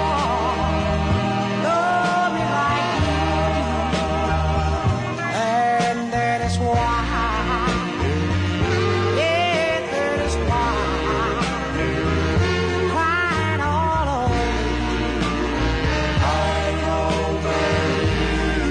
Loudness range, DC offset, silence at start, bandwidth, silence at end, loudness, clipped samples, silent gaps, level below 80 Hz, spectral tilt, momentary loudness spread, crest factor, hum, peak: 1 LU; under 0.1%; 0 s; 10.5 kHz; 0 s; -21 LUFS; under 0.1%; none; -30 dBFS; -5.5 dB/octave; 3 LU; 12 dB; none; -8 dBFS